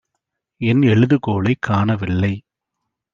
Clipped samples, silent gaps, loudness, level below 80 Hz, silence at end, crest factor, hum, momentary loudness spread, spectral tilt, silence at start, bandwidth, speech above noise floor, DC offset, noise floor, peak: under 0.1%; none; -17 LUFS; -52 dBFS; 0.75 s; 16 dB; none; 9 LU; -8.5 dB/octave; 0.6 s; 7.2 kHz; 62 dB; under 0.1%; -79 dBFS; -2 dBFS